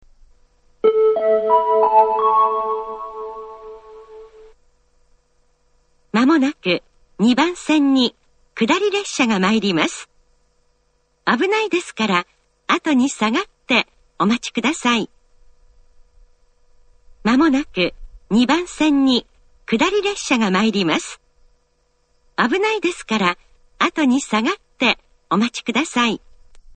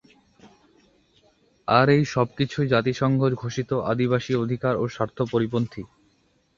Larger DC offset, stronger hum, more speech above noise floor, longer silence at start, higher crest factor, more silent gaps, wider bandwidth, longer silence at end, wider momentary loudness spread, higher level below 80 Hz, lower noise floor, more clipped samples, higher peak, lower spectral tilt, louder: neither; neither; first, 46 dB vs 42 dB; first, 0.85 s vs 0.45 s; about the same, 20 dB vs 22 dB; neither; first, 9.4 kHz vs 7.4 kHz; second, 0.2 s vs 0.75 s; first, 12 LU vs 9 LU; about the same, -52 dBFS vs -56 dBFS; about the same, -63 dBFS vs -65 dBFS; neither; first, 0 dBFS vs -4 dBFS; second, -4 dB/octave vs -7 dB/octave; first, -18 LUFS vs -23 LUFS